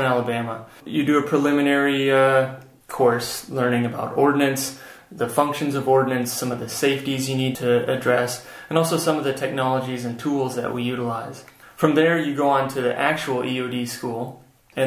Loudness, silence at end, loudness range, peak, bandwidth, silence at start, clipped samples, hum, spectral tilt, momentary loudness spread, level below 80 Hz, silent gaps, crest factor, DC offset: -22 LUFS; 0 s; 3 LU; -2 dBFS; 16 kHz; 0 s; under 0.1%; none; -5 dB/octave; 11 LU; -62 dBFS; none; 20 dB; under 0.1%